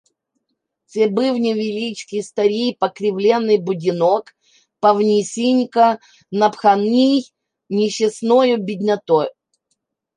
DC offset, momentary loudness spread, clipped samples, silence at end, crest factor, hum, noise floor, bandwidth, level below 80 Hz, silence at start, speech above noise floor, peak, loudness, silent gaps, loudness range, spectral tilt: under 0.1%; 10 LU; under 0.1%; 0.85 s; 16 dB; none; -75 dBFS; 10.5 kHz; -72 dBFS; 0.95 s; 58 dB; -2 dBFS; -18 LUFS; none; 3 LU; -5.5 dB/octave